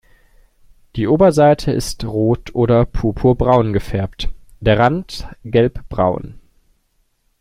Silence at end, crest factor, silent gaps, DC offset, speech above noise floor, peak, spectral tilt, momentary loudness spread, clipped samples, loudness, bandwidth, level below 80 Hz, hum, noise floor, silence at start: 1 s; 16 dB; none; under 0.1%; 47 dB; 0 dBFS; -7 dB/octave; 15 LU; under 0.1%; -16 LUFS; 15 kHz; -32 dBFS; none; -62 dBFS; 0.95 s